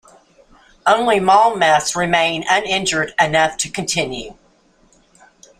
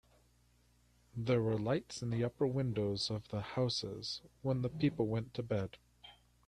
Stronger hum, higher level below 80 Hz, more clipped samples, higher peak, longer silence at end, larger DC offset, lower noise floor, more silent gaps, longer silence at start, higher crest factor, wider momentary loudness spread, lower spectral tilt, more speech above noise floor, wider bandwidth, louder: second, none vs 60 Hz at -60 dBFS; first, -50 dBFS vs -64 dBFS; neither; first, -2 dBFS vs -22 dBFS; first, 1.25 s vs 0.35 s; neither; second, -55 dBFS vs -70 dBFS; neither; second, 0.85 s vs 1.15 s; about the same, 16 dB vs 16 dB; about the same, 9 LU vs 8 LU; second, -2.5 dB/octave vs -6.5 dB/octave; first, 39 dB vs 34 dB; first, 15 kHz vs 11 kHz; first, -16 LUFS vs -37 LUFS